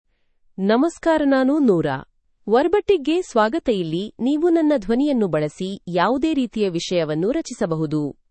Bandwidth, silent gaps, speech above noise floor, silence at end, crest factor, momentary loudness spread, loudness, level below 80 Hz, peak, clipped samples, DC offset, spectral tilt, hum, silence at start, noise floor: 8.8 kHz; none; 41 dB; 0.2 s; 16 dB; 8 LU; -20 LUFS; -50 dBFS; -4 dBFS; under 0.1%; under 0.1%; -6 dB/octave; none; 0.6 s; -60 dBFS